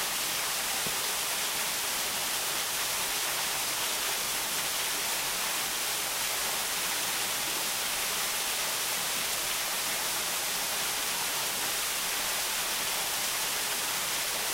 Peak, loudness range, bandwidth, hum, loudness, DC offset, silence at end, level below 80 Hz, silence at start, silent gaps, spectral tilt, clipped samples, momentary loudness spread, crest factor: -16 dBFS; 0 LU; 16 kHz; none; -28 LUFS; under 0.1%; 0 s; -62 dBFS; 0 s; none; 1 dB/octave; under 0.1%; 0 LU; 14 dB